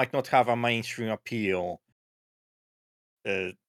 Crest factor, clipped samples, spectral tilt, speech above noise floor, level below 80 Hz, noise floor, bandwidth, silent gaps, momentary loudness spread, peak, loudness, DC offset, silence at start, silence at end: 22 dB; under 0.1%; -5 dB/octave; over 62 dB; -78 dBFS; under -90 dBFS; 16 kHz; 1.92-3.17 s; 12 LU; -8 dBFS; -28 LUFS; under 0.1%; 0 s; 0.15 s